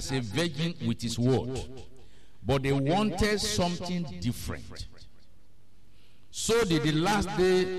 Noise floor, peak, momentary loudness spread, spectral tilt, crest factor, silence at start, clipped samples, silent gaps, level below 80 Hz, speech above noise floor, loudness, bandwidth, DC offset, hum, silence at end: -62 dBFS; -14 dBFS; 15 LU; -5 dB/octave; 16 dB; 0 s; under 0.1%; none; -46 dBFS; 34 dB; -28 LUFS; 13 kHz; 0.8%; none; 0 s